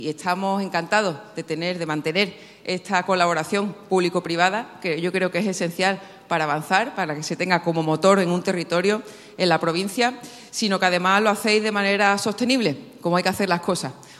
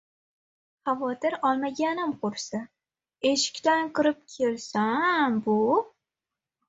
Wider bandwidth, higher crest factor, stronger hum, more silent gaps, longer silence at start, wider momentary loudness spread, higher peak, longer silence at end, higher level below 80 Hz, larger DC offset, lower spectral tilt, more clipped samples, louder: first, 13.5 kHz vs 8 kHz; about the same, 20 dB vs 16 dB; neither; neither; second, 0 s vs 0.85 s; about the same, 9 LU vs 8 LU; first, -2 dBFS vs -10 dBFS; second, 0 s vs 0.8 s; about the same, -68 dBFS vs -72 dBFS; neither; about the same, -4.5 dB/octave vs -3.5 dB/octave; neither; first, -22 LUFS vs -26 LUFS